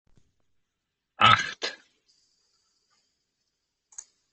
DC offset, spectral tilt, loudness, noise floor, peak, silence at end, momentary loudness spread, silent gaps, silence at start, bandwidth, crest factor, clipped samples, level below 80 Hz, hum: under 0.1%; -2.5 dB/octave; -22 LUFS; -83 dBFS; -2 dBFS; 2.6 s; 26 LU; none; 1.2 s; 8.4 kHz; 28 dB; under 0.1%; -62 dBFS; none